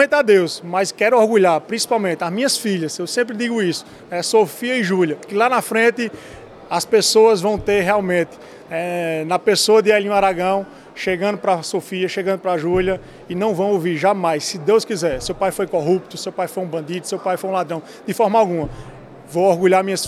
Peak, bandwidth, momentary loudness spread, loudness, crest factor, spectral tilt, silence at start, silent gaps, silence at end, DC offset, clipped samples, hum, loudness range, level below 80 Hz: -2 dBFS; 14.5 kHz; 12 LU; -18 LUFS; 16 dB; -4 dB/octave; 0 s; none; 0 s; under 0.1%; under 0.1%; none; 4 LU; -48 dBFS